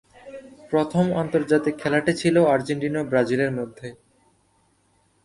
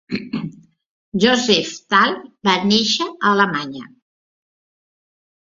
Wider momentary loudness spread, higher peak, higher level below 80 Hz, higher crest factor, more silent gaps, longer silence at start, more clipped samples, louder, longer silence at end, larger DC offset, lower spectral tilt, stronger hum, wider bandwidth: first, 21 LU vs 13 LU; second, -6 dBFS vs -2 dBFS; about the same, -58 dBFS vs -58 dBFS; about the same, 18 dB vs 20 dB; second, none vs 0.86-1.12 s; first, 0.25 s vs 0.1 s; neither; second, -22 LUFS vs -17 LUFS; second, 1.3 s vs 1.7 s; neither; first, -6.5 dB/octave vs -3.5 dB/octave; neither; first, 11.5 kHz vs 7.6 kHz